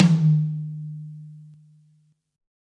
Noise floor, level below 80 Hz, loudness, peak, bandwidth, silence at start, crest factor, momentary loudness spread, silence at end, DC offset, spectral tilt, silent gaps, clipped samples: -63 dBFS; -70 dBFS; -23 LUFS; -4 dBFS; 8 kHz; 0 s; 20 dB; 23 LU; 1.2 s; under 0.1%; -8 dB/octave; none; under 0.1%